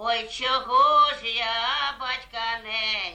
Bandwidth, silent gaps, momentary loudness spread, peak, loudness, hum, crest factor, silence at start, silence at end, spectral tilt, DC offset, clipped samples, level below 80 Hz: 9.2 kHz; none; 11 LU; -10 dBFS; -23 LUFS; none; 16 dB; 0 s; 0 s; -1 dB/octave; under 0.1%; under 0.1%; -56 dBFS